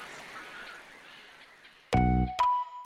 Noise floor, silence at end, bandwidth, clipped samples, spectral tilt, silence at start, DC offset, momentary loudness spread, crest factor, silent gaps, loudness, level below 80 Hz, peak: -56 dBFS; 0 s; 13 kHz; under 0.1%; -6.5 dB/octave; 0 s; under 0.1%; 23 LU; 18 dB; none; -28 LUFS; -40 dBFS; -14 dBFS